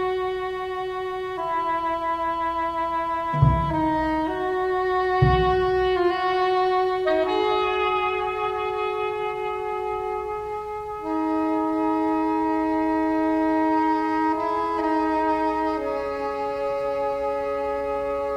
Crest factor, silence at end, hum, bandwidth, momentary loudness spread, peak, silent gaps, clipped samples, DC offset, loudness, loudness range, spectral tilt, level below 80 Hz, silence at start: 18 dB; 0 s; none; 10.5 kHz; 7 LU; -6 dBFS; none; under 0.1%; under 0.1%; -24 LUFS; 4 LU; -7.5 dB/octave; -40 dBFS; 0 s